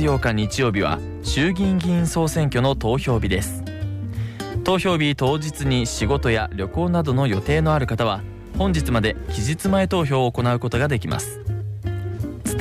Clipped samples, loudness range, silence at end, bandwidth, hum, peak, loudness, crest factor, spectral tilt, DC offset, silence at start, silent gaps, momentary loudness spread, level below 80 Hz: under 0.1%; 2 LU; 0 s; 15.5 kHz; none; -10 dBFS; -22 LUFS; 12 dB; -6 dB/octave; under 0.1%; 0 s; none; 9 LU; -34 dBFS